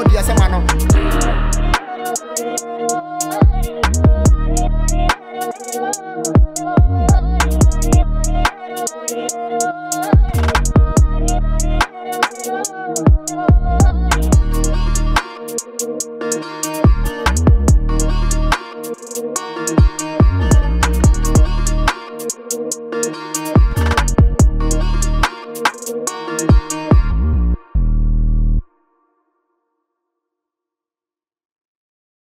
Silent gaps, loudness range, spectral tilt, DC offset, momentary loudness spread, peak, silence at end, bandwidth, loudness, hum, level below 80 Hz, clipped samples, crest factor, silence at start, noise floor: none; 2 LU; -5 dB/octave; under 0.1%; 9 LU; -2 dBFS; 3.75 s; 16 kHz; -17 LUFS; none; -18 dBFS; under 0.1%; 12 dB; 0 s; under -90 dBFS